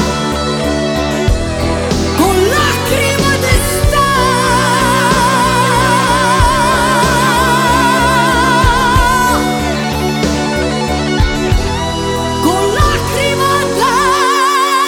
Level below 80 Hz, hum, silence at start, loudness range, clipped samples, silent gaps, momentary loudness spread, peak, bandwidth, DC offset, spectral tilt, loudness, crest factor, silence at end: -22 dBFS; none; 0 s; 4 LU; under 0.1%; none; 5 LU; 0 dBFS; 19 kHz; under 0.1%; -4 dB/octave; -12 LUFS; 12 dB; 0 s